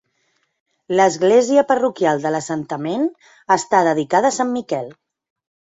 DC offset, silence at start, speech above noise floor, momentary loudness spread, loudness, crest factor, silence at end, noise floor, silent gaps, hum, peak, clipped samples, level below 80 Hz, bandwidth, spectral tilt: under 0.1%; 0.9 s; 50 dB; 10 LU; -18 LUFS; 16 dB; 0.85 s; -67 dBFS; none; none; -2 dBFS; under 0.1%; -64 dBFS; 8 kHz; -4.5 dB/octave